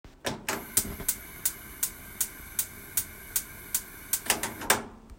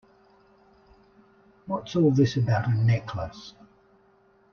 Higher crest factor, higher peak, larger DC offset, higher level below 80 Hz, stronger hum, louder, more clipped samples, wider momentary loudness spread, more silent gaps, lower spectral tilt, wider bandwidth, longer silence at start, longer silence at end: first, 30 dB vs 16 dB; first, -2 dBFS vs -10 dBFS; neither; first, -52 dBFS vs -58 dBFS; neither; second, -30 LUFS vs -25 LUFS; neither; second, 5 LU vs 23 LU; neither; second, -1 dB/octave vs -8 dB/octave; first, 16.5 kHz vs 6.8 kHz; second, 0.05 s vs 1.65 s; second, 0 s vs 1 s